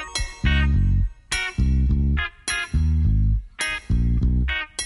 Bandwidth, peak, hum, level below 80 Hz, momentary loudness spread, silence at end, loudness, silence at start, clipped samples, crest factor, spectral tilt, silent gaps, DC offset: 11.5 kHz; -8 dBFS; none; -22 dBFS; 5 LU; 0 s; -23 LUFS; 0 s; under 0.1%; 14 dB; -4.5 dB/octave; none; under 0.1%